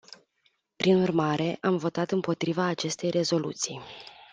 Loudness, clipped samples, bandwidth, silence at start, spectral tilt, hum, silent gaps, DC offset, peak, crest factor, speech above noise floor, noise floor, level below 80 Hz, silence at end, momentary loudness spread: -27 LUFS; under 0.1%; 10 kHz; 0.8 s; -5 dB/octave; none; none; under 0.1%; -10 dBFS; 18 dB; 44 dB; -71 dBFS; -68 dBFS; 0.1 s; 9 LU